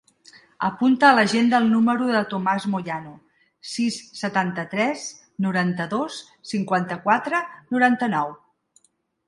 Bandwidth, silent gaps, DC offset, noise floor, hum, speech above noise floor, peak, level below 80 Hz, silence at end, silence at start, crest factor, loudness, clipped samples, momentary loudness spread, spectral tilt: 11.5 kHz; none; under 0.1%; -66 dBFS; none; 44 dB; -2 dBFS; -68 dBFS; 0.9 s; 0.6 s; 20 dB; -22 LUFS; under 0.1%; 14 LU; -5 dB/octave